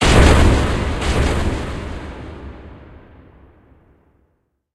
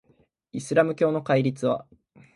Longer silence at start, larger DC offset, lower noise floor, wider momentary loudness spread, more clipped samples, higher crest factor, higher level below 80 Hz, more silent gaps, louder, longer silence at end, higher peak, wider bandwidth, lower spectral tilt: second, 0 s vs 0.55 s; neither; about the same, -66 dBFS vs -64 dBFS; first, 25 LU vs 12 LU; neither; about the same, 18 dB vs 20 dB; first, -22 dBFS vs -66 dBFS; neither; first, -17 LUFS vs -24 LUFS; first, 1.95 s vs 0.55 s; first, 0 dBFS vs -6 dBFS; about the same, 12.5 kHz vs 11.5 kHz; about the same, -5.5 dB/octave vs -6.5 dB/octave